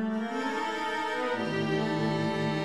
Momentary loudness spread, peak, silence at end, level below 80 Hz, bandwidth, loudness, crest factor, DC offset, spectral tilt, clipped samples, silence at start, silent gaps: 3 LU; -16 dBFS; 0 s; -66 dBFS; 12.5 kHz; -30 LUFS; 12 dB; 0.2%; -6 dB/octave; under 0.1%; 0 s; none